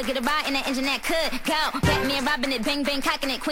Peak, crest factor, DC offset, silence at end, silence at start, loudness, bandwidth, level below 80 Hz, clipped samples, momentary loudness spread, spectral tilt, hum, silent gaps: -8 dBFS; 16 dB; under 0.1%; 0 s; 0 s; -24 LUFS; 16 kHz; -42 dBFS; under 0.1%; 2 LU; -3.5 dB/octave; none; none